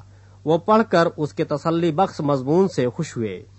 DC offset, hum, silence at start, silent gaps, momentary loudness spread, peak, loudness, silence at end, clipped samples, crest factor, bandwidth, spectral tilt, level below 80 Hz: under 0.1%; none; 0.45 s; none; 10 LU; -4 dBFS; -21 LUFS; 0.15 s; under 0.1%; 18 dB; 8.4 kHz; -7 dB/octave; -58 dBFS